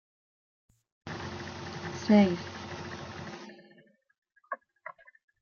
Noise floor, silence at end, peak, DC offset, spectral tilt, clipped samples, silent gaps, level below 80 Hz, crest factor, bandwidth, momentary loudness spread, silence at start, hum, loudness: -62 dBFS; 0.5 s; -10 dBFS; under 0.1%; -6.5 dB/octave; under 0.1%; 4.18-4.22 s; -68 dBFS; 24 dB; 7 kHz; 25 LU; 1.05 s; none; -31 LUFS